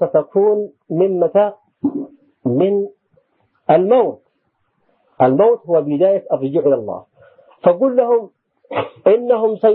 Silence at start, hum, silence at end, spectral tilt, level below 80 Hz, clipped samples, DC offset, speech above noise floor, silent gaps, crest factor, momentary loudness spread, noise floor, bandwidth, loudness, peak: 0 s; none; 0 s; -12.5 dB/octave; -66 dBFS; under 0.1%; under 0.1%; 52 dB; none; 16 dB; 11 LU; -67 dBFS; 4.1 kHz; -16 LUFS; 0 dBFS